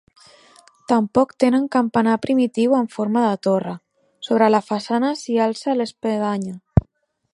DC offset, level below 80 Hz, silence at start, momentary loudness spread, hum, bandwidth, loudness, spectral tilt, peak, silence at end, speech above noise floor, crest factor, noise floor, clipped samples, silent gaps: under 0.1%; -40 dBFS; 0.9 s; 6 LU; none; 11.5 kHz; -20 LUFS; -7 dB/octave; 0 dBFS; 0.55 s; 48 dB; 20 dB; -67 dBFS; under 0.1%; none